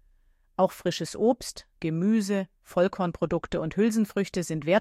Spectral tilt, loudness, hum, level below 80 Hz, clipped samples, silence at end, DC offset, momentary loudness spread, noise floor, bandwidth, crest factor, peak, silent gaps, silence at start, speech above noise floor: -6 dB/octave; -27 LUFS; none; -54 dBFS; under 0.1%; 0 s; under 0.1%; 7 LU; -63 dBFS; 15.5 kHz; 18 dB; -10 dBFS; none; 0.6 s; 36 dB